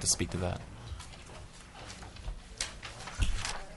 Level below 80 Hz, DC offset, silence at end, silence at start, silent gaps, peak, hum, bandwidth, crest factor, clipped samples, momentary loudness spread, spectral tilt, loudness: -42 dBFS; under 0.1%; 0 s; 0 s; none; -14 dBFS; none; 11.5 kHz; 22 dB; under 0.1%; 15 LU; -3 dB/octave; -38 LUFS